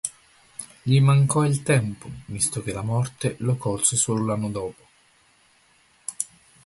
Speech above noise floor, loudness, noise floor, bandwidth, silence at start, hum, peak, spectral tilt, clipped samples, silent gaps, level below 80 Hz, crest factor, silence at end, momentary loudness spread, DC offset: 37 dB; -23 LUFS; -60 dBFS; 12 kHz; 0.05 s; none; -4 dBFS; -5 dB/octave; under 0.1%; none; -54 dBFS; 20 dB; 0.4 s; 18 LU; under 0.1%